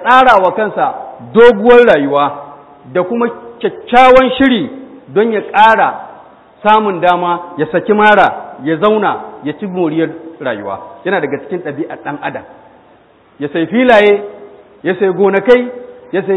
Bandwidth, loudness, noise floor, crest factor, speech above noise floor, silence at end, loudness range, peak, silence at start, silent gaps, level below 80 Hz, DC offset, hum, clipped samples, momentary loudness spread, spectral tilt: 8.2 kHz; -11 LUFS; -45 dBFS; 12 dB; 35 dB; 0 s; 9 LU; 0 dBFS; 0 s; none; -44 dBFS; under 0.1%; none; 0.6%; 16 LU; -6.5 dB/octave